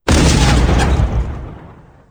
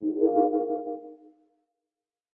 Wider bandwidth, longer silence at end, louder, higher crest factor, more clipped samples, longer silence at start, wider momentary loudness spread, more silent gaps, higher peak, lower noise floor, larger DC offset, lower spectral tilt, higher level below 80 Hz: first, 10 kHz vs 1.8 kHz; second, 0.4 s vs 1.15 s; first, -14 LUFS vs -26 LUFS; about the same, 14 dB vs 18 dB; neither; about the same, 0.05 s vs 0 s; about the same, 17 LU vs 15 LU; neither; first, 0 dBFS vs -10 dBFS; second, -39 dBFS vs under -90 dBFS; neither; second, -5 dB/octave vs -12 dB/octave; first, -16 dBFS vs -78 dBFS